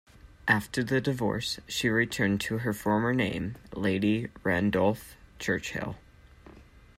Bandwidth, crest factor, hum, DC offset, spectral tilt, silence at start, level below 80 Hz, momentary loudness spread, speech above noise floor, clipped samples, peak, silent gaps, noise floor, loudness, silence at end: 16 kHz; 20 dB; none; under 0.1%; -5.5 dB/octave; 0.25 s; -54 dBFS; 10 LU; 25 dB; under 0.1%; -10 dBFS; none; -53 dBFS; -29 LUFS; 0.35 s